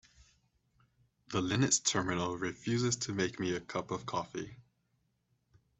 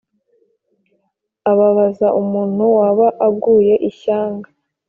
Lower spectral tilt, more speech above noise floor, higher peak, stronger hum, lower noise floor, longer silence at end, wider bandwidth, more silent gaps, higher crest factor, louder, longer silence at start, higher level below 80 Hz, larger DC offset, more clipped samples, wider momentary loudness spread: second, -3.5 dB/octave vs -8 dB/octave; second, 44 dB vs 55 dB; second, -16 dBFS vs -2 dBFS; neither; first, -78 dBFS vs -69 dBFS; first, 1.2 s vs 0.45 s; first, 8.4 kHz vs 3.6 kHz; neither; first, 20 dB vs 14 dB; second, -34 LUFS vs -15 LUFS; second, 1.3 s vs 1.45 s; second, -66 dBFS vs -60 dBFS; neither; neither; first, 10 LU vs 7 LU